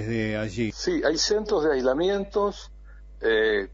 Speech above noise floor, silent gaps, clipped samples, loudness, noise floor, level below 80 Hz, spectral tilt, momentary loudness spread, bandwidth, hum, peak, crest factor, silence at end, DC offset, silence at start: 20 dB; none; under 0.1%; -25 LUFS; -44 dBFS; -44 dBFS; -4 dB/octave; 7 LU; 8 kHz; none; -12 dBFS; 14 dB; 0 s; under 0.1%; 0 s